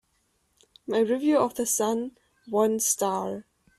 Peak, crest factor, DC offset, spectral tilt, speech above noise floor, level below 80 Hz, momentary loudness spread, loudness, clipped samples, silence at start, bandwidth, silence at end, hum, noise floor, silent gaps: -10 dBFS; 18 dB; under 0.1%; -3.5 dB/octave; 46 dB; -68 dBFS; 13 LU; -25 LUFS; under 0.1%; 0.9 s; 15.5 kHz; 0.35 s; none; -71 dBFS; none